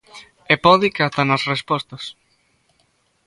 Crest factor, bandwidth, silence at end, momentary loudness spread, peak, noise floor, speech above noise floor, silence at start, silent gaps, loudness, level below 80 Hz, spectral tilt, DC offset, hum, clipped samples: 20 dB; 11.5 kHz; 1.15 s; 18 LU; 0 dBFS; -63 dBFS; 45 dB; 0.15 s; none; -17 LUFS; -56 dBFS; -5.5 dB/octave; under 0.1%; none; under 0.1%